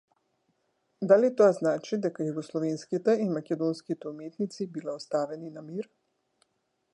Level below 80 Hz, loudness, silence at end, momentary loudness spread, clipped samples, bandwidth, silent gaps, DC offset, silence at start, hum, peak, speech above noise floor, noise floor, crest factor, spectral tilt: -82 dBFS; -28 LUFS; 1.1 s; 16 LU; under 0.1%; 10.5 kHz; none; under 0.1%; 1 s; none; -8 dBFS; 49 dB; -77 dBFS; 22 dB; -7 dB/octave